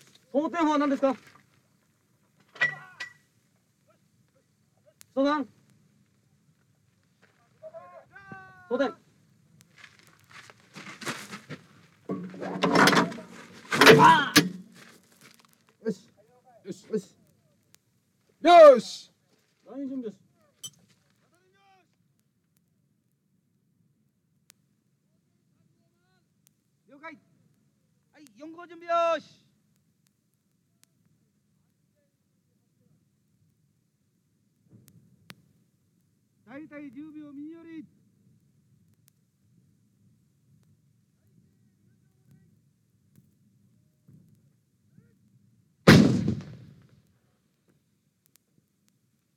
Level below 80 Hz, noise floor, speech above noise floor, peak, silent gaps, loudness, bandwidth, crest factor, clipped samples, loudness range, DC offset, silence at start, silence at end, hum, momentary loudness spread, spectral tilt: -62 dBFS; -73 dBFS; 50 dB; -2 dBFS; none; -22 LUFS; 16.5 kHz; 26 dB; under 0.1%; 25 LU; under 0.1%; 0.35 s; 2.95 s; none; 30 LU; -5 dB/octave